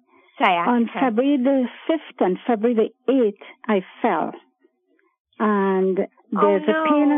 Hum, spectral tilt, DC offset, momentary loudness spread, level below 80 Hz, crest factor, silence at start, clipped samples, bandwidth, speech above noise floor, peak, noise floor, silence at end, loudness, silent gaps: none; -9 dB/octave; under 0.1%; 7 LU; -70 dBFS; 18 dB; 0.4 s; under 0.1%; 3.8 kHz; 46 dB; -2 dBFS; -65 dBFS; 0 s; -21 LUFS; 5.20-5.25 s